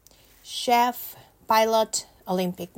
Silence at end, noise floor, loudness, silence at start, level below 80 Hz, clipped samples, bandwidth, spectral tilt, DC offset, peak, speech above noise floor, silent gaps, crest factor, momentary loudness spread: 0.1 s; -51 dBFS; -24 LUFS; 0.45 s; -62 dBFS; under 0.1%; 16.5 kHz; -3.5 dB/octave; under 0.1%; -8 dBFS; 27 dB; none; 18 dB; 14 LU